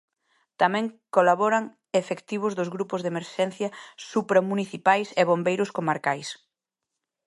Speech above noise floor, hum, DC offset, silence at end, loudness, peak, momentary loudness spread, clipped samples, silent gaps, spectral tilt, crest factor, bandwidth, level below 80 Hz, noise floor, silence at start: 61 dB; none; under 0.1%; 0.9 s; -25 LUFS; -4 dBFS; 9 LU; under 0.1%; none; -5.5 dB/octave; 22 dB; 11.5 kHz; -78 dBFS; -86 dBFS; 0.6 s